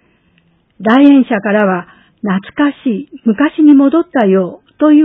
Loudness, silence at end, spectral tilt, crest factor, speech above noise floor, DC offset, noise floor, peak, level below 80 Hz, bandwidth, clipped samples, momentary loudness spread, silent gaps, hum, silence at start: -11 LUFS; 0 s; -9.5 dB/octave; 12 dB; 44 dB; under 0.1%; -54 dBFS; 0 dBFS; -58 dBFS; 3.9 kHz; 0.2%; 12 LU; none; none; 0.8 s